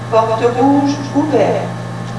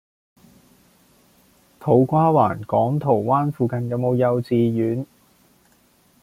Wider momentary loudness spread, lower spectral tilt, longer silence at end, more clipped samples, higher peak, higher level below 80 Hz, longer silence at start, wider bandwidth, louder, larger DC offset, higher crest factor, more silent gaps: about the same, 9 LU vs 8 LU; second, -7 dB/octave vs -10 dB/octave; second, 0 s vs 1.2 s; neither; first, 0 dBFS vs -4 dBFS; first, -50 dBFS vs -58 dBFS; second, 0 s vs 1.8 s; second, 11 kHz vs 15.5 kHz; first, -14 LUFS vs -20 LUFS; first, 0.6% vs under 0.1%; about the same, 14 dB vs 18 dB; neither